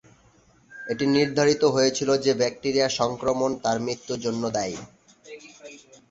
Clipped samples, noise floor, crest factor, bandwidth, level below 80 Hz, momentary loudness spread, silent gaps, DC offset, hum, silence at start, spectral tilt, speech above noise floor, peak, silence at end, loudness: under 0.1%; -58 dBFS; 18 dB; 8 kHz; -60 dBFS; 23 LU; none; under 0.1%; none; 0.7 s; -4 dB/octave; 35 dB; -6 dBFS; 0.35 s; -24 LUFS